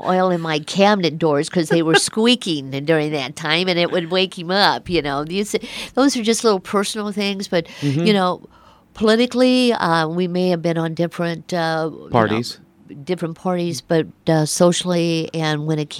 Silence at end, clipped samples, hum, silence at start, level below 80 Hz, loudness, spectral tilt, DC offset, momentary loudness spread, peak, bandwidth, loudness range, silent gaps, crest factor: 0 s; under 0.1%; none; 0 s; -54 dBFS; -19 LUFS; -4.5 dB/octave; under 0.1%; 8 LU; 0 dBFS; 15.5 kHz; 4 LU; none; 18 dB